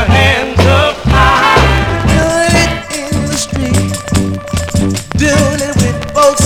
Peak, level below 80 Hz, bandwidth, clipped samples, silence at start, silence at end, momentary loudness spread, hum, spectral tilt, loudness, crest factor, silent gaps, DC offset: 0 dBFS; -20 dBFS; 17 kHz; 0.4%; 0 s; 0 s; 7 LU; none; -4.5 dB/octave; -11 LUFS; 10 dB; none; under 0.1%